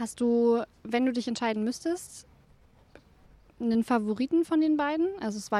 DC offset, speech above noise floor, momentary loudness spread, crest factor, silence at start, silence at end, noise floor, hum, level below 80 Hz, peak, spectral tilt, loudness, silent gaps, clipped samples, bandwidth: under 0.1%; 32 dB; 9 LU; 14 dB; 0 s; 0 s; -59 dBFS; none; -64 dBFS; -14 dBFS; -5 dB/octave; -28 LUFS; none; under 0.1%; 13.5 kHz